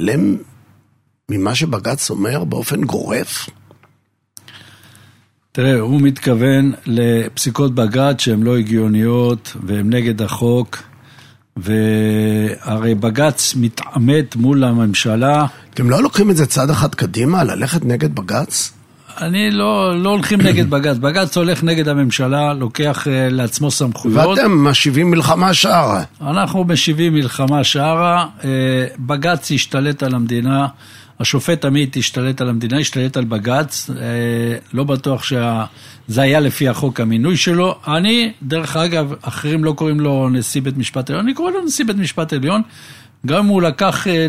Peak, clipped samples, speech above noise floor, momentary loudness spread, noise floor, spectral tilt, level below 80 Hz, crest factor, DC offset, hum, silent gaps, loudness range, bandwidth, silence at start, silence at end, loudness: 0 dBFS; under 0.1%; 45 dB; 7 LU; -60 dBFS; -5 dB/octave; -52 dBFS; 16 dB; under 0.1%; none; none; 5 LU; 16 kHz; 0 s; 0 s; -15 LUFS